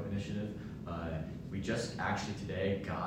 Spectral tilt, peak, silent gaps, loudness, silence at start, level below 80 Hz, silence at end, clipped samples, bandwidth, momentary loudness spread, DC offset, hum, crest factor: -6 dB/octave; -22 dBFS; none; -38 LUFS; 0 s; -56 dBFS; 0 s; under 0.1%; 14 kHz; 7 LU; under 0.1%; none; 16 dB